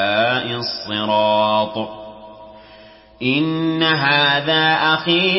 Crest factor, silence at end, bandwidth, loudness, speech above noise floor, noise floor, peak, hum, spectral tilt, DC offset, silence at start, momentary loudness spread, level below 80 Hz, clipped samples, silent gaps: 16 dB; 0 s; 5.8 kHz; -17 LUFS; 27 dB; -44 dBFS; -4 dBFS; none; -8.5 dB/octave; under 0.1%; 0 s; 10 LU; -56 dBFS; under 0.1%; none